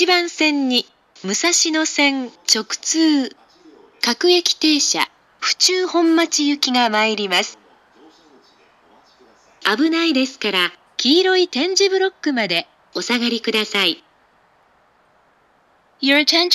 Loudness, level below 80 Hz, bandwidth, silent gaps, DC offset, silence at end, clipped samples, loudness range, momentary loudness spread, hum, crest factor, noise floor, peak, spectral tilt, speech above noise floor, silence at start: -17 LUFS; -74 dBFS; 15.5 kHz; none; under 0.1%; 0 s; under 0.1%; 6 LU; 7 LU; none; 18 dB; -57 dBFS; 0 dBFS; -1.5 dB/octave; 40 dB; 0 s